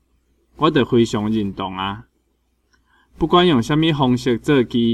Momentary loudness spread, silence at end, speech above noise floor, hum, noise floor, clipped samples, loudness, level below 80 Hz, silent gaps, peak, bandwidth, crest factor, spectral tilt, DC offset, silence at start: 10 LU; 0 s; 48 dB; none; -65 dBFS; under 0.1%; -18 LUFS; -46 dBFS; none; -2 dBFS; 12.5 kHz; 16 dB; -6.5 dB/octave; under 0.1%; 0.6 s